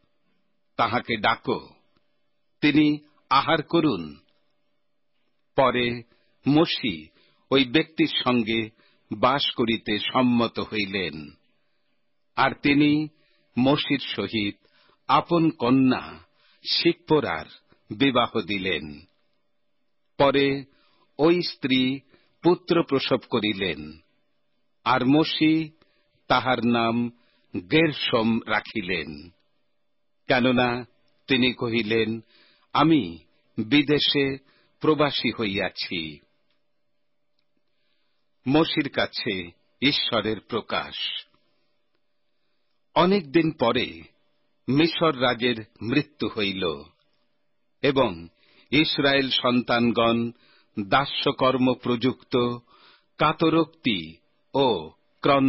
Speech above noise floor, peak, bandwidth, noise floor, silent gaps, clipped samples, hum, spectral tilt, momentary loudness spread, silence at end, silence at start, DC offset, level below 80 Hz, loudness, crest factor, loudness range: 56 dB; -8 dBFS; 5.8 kHz; -79 dBFS; none; under 0.1%; none; -9.5 dB/octave; 13 LU; 0 s; 0.8 s; under 0.1%; -56 dBFS; -23 LUFS; 18 dB; 4 LU